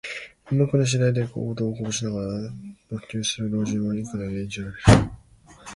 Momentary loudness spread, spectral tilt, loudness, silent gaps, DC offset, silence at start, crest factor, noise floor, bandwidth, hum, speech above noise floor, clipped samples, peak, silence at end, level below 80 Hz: 17 LU; -5.5 dB/octave; -24 LUFS; none; under 0.1%; 0.05 s; 24 dB; -50 dBFS; 11.5 kHz; none; 27 dB; under 0.1%; 0 dBFS; 0 s; -40 dBFS